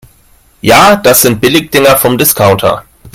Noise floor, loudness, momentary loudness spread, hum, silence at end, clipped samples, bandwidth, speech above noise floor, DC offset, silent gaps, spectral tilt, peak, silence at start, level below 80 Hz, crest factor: -45 dBFS; -6 LUFS; 8 LU; none; 0.05 s; 2%; over 20 kHz; 38 dB; under 0.1%; none; -3.5 dB/octave; 0 dBFS; 0.65 s; -36 dBFS; 8 dB